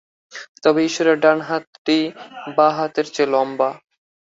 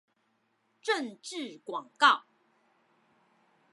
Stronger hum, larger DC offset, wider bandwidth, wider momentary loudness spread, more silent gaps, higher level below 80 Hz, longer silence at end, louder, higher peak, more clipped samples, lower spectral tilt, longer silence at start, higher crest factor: neither; neither; second, 7.8 kHz vs 11.5 kHz; about the same, 14 LU vs 16 LU; first, 0.49-0.55 s, 1.67-1.85 s vs none; first, -66 dBFS vs under -90 dBFS; second, 0.55 s vs 1.55 s; first, -19 LUFS vs -30 LUFS; first, -2 dBFS vs -8 dBFS; neither; first, -4.5 dB/octave vs -1 dB/octave; second, 0.35 s vs 0.85 s; second, 18 dB vs 26 dB